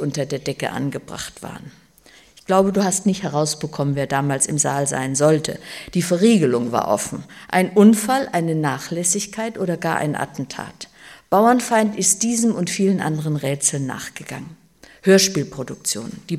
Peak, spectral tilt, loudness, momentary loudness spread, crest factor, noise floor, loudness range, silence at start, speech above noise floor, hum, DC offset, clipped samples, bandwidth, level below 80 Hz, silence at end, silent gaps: -2 dBFS; -4.5 dB/octave; -19 LUFS; 16 LU; 18 dB; -50 dBFS; 4 LU; 0 s; 31 dB; none; under 0.1%; under 0.1%; 15.5 kHz; -56 dBFS; 0 s; none